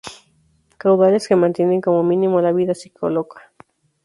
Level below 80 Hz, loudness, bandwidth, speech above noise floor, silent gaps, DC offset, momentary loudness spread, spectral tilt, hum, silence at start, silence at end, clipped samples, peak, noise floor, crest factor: -62 dBFS; -17 LUFS; 11.5 kHz; 43 dB; none; under 0.1%; 9 LU; -7.5 dB/octave; none; 0.05 s; 0.65 s; under 0.1%; -2 dBFS; -59 dBFS; 16 dB